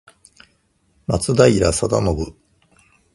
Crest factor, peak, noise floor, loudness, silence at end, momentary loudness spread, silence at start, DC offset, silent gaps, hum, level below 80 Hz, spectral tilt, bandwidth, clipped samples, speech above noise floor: 20 dB; 0 dBFS; -62 dBFS; -17 LUFS; 0.85 s; 15 LU; 1.1 s; under 0.1%; none; none; -36 dBFS; -5.5 dB/octave; 11.5 kHz; under 0.1%; 46 dB